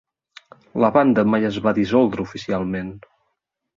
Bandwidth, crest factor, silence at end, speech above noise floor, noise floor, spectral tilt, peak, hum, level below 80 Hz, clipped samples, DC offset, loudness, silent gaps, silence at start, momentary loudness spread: 7.4 kHz; 18 dB; 0.8 s; 56 dB; -75 dBFS; -7.5 dB/octave; -2 dBFS; none; -52 dBFS; under 0.1%; under 0.1%; -19 LUFS; none; 0.75 s; 13 LU